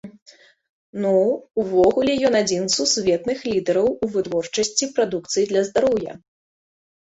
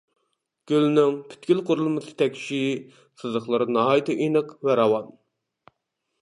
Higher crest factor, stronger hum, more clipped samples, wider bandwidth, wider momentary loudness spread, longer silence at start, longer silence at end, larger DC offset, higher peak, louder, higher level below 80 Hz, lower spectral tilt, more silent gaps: about the same, 16 dB vs 18 dB; neither; neither; second, 8.4 kHz vs 11 kHz; second, 6 LU vs 10 LU; second, 0.05 s vs 0.7 s; second, 0.85 s vs 1.15 s; neither; about the same, -4 dBFS vs -6 dBFS; first, -20 LUFS vs -23 LUFS; first, -56 dBFS vs -76 dBFS; second, -3.5 dB/octave vs -6.5 dB/octave; first, 0.22-0.26 s, 0.69-0.93 s vs none